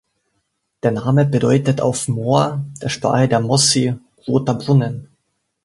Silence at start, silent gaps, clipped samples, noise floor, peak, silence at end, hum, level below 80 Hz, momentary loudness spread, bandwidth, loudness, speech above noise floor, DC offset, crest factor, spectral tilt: 0.85 s; none; under 0.1%; -71 dBFS; -2 dBFS; 0.6 s; none; -52 dBFS; 10 LU; 11.5 kHz; -17 LUFS; 54 dB; under 0.1%; 16 dB; -5 dB/octave